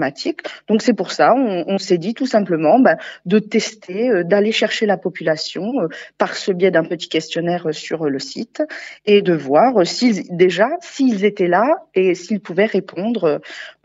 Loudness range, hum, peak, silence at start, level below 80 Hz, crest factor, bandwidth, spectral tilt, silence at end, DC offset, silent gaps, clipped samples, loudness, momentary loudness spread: 4 LU; none; 0 dBFS; 0 s; -72 dBFS; 16 dB; 8 kHz; -4 dB/octave; 0.15 s; under 0.1%; none; under 0.1%; -17 LUFS; 10 LU